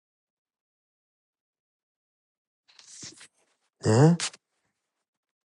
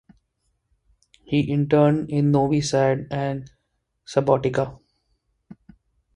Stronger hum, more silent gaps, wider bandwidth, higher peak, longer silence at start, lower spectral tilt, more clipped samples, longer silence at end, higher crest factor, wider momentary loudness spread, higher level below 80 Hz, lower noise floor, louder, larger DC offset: neither; neither; about the same, 11.5 kHz vs 10.5 kHz; second, -8 dBFS vs -4 dBFS; first, 3 s vs 1.3 s; about the same, -6 dB/octave vs -7 dB/octave; neither; first, 1.15 s vs 0.6 s; about the same, 24 dB vs 20 dB; first, 23 LU vs 9 LU; second, -64 dBFS vs -54 dBFS; first, -80 dBFS vs -74 dBFS; about the same, -23 LUFS vs -22 LUFS; neither